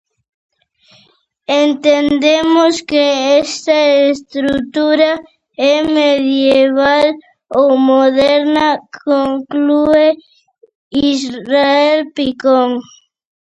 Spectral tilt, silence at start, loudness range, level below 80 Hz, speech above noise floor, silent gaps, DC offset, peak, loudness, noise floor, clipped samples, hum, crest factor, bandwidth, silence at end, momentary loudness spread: -3.5 dB/octave; 1.5 s; 3 LU; -50 dBFS; 42 dB; 10.75-10.91 s; under 0.1%; 0 dBFS; -12 LUFS; -53 dBFS; under 0.1%; none; 12 dB; 8.2 kHz; 0.6 s; 8 LU